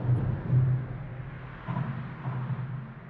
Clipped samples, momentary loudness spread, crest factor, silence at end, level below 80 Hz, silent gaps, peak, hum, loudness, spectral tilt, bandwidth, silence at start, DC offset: under 0.1%; 14 LU; 16 dB; 0 s; -48 dBFS; none; -14 dBFS; none; -32 LUFS; -11 dB/octave; 3.9 kHz; 0 s; under 0.1%